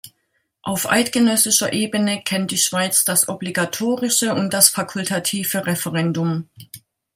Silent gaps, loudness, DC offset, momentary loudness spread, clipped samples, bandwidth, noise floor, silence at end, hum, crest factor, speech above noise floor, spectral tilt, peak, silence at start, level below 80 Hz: none; -18 LUFS; under 0.1%; 9 LU; under 0.1%; 16.5 kHz; -70 dBFS; 0.35 s; none; 20 dB; 50 dB; -3 dB/octave; 0 dBFS; 0.05 s; -64 dBFS